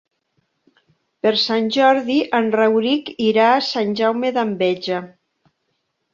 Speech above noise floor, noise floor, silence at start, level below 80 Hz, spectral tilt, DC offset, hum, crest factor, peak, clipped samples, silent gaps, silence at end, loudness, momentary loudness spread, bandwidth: 54 dB; -72 dBFS; 1.25 s; -66 dBFS; -5 dB/octave; under 0.1%; none; 18 dB; -2 dBFS; under 0.1%; none; 1.05 s; -18 LUFS; 6 LU; 7.4 kHz